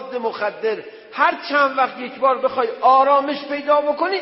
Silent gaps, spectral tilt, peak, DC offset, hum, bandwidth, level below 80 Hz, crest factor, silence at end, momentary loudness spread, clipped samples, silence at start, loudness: none; -7.5 dB/octave; -4 dBFS; under 0.1%; none; 5.8 kHz; -74 dBFS; 16 dB; 0 s; 10 LU; under 0.1%; 0 s; -19 LUFS